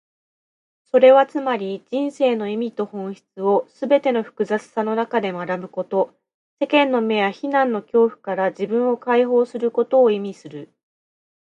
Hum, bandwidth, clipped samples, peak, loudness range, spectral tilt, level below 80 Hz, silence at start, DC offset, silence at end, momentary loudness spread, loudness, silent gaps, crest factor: none; 8.6 kHz; under 0.1%; -2 dBFS; 3 LU; -6.5 dB/octave; -74 dBFS; 0.95 s; under 0.1%; 0.9 s; 11 LU; -20 LUFS; 6.34-6.57 s; 18 dB